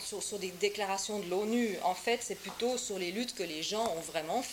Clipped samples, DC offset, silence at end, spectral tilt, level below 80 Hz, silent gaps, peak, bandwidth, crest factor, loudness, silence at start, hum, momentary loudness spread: under 0.1%; under 0.1%; 0 s; -2.5 dB/octave; -68 dBFS; none; -16 dBFS; 17 kHz; 18 dB; -34 LUFS; 0 s; none; 5 LU